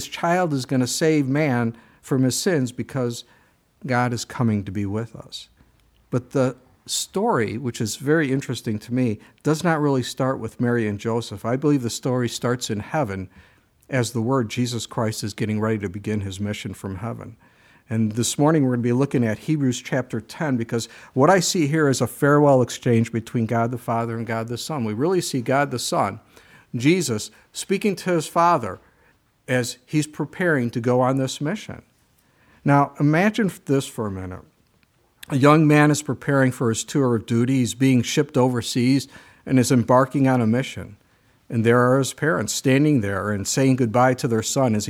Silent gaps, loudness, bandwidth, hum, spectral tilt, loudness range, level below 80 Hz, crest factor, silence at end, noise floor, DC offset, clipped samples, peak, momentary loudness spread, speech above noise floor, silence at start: none; -22 LUFS; 17 kHz; none; -5.5 dB/octave; 6 LU; -60 dBFS; 20 dB; 0 s; -62 dBFS; under 0.1%; under 0.1%; -2 dBFS; 11 LU; 41 dB; 0 s